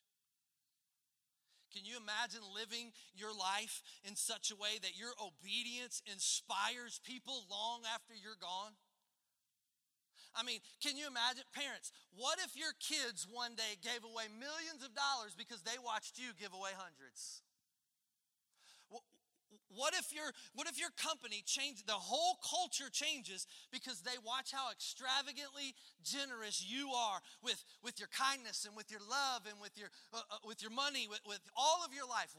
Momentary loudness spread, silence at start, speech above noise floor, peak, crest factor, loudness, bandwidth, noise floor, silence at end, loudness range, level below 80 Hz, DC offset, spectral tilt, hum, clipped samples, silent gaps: 12 LU; 1.7 s; 44 dB; -22 dBFS; 22 dB; -42 LUFS; 16 kHz; -88 dBFS; 0 s; 7 LU; under -90 dBFS; under 0.1%; 0.5 dB/octave; none; under 0.1%; none